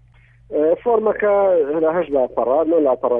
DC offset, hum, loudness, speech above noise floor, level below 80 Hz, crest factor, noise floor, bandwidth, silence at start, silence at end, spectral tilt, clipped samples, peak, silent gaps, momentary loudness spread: under 0.1%; none; -18 LUFS; 33 dB; -52 dBFS; 12 dB; -50 dBFS; 3.6 kHz; 0.5 s; 0 s; -10 dB/octave; under 0.1%; -6 dBFS; none; 4 LU